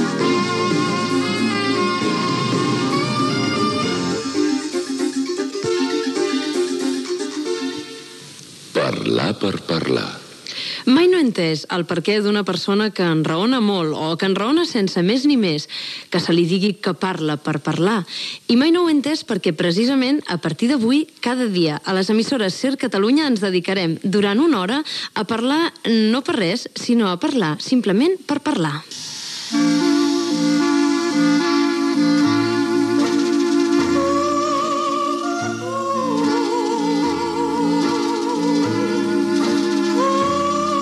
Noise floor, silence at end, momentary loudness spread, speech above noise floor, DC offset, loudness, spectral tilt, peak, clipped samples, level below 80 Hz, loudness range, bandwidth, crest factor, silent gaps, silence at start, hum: -39 dBFS; 0 s; 7 LU; 21 dB; under 0.1%; -19 LUFS; -5 dB/octave; -4 dBFS; under 0.1%; -62 dBFS; 4 LU; 12.5 kHz; 14 dB; none; 0 s; none